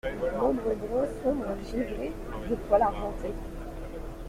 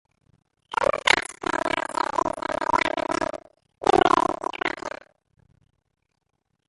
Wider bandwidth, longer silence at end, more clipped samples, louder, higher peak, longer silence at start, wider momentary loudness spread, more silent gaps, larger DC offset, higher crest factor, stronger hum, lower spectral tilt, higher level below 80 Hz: first, 16 kHz vs 11.5 kHz; second, 0 s vs 1.8 s; neither; second, -30 LUFS vs -24 LUFS; second, -10 dBFS vs 0 dBFS; second, 0.05 s vs 0.7 s; first, 15 LU vs 11 LU; neither; neither; second, 20 dB vs 26 dB; neither; first, -7 dB/octave vs -3 dB/octave; first, -40 dBFS vs -54 dBFS